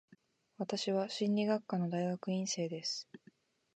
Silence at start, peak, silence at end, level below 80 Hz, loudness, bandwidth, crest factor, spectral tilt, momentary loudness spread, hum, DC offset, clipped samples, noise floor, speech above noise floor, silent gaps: 0.6 s; -20 dBFS; 0.6 s; -86 dBFS; -36 LUFS; 9 kHz; 16 dB; -5 dB/octave; 7 LU; none; under 0.1%; under 0.1%; -67 dBFS; 32 dB; none